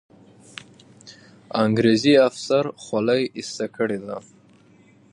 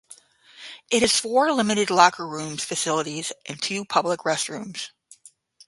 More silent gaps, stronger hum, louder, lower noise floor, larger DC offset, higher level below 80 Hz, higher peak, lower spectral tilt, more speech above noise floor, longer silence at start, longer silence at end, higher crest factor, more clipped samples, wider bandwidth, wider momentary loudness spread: neither; neither; about the same, -21 LUFS vs -23 LUFS; about the same, -53 dBFS vs -53 dBFS; neither; about the same, -66 dBFS vs -64 dBFS; second, -4 dBFS vs 0 dBFS; first, -5.5 dB/octave vs -2.5 dB/octave; about the same, 33 dB vs 30 dB; first, 1.05 s vs 0.6 s; first, 0.95 s vs 0.8 s; second, 18 dB vs 24 dB; neither; about the same, 11 kHz vs 11.5 kHz; first, 23 LU vs 16 LU